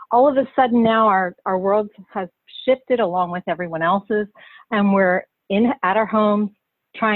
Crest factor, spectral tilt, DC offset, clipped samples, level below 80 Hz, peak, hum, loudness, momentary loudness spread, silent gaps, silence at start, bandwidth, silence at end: 14 dB; -10 dB/octave; under 0.1%; under 0.1%; -60 dBFS; -4 dBFS; none; -19 LUFS; 11 LU; none; 0 s; 4.3 kHz; 0 s